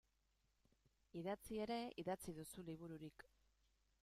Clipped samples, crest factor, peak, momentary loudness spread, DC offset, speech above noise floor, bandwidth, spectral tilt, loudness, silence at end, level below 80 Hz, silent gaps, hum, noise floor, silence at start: under 0.1%; 20 dB; -32 dBFS; 12 LU; under 0.1%; 34 dB; 15.5 kHz; -5.5 dB/octave; -50 LUFS; 0.8 s; -76 dBFS; none; none; -84 dBFS; 1.15 s